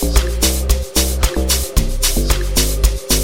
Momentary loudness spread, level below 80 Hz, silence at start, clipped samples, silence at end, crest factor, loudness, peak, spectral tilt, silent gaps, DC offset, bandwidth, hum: 3 LU; -16 dBFS; 0 s; under 0.1%; 0 s; 16 dB; -16 LUFS; 0 dBFS; -3.5 dB/octave; none; under 0.1%; 17 kHz; none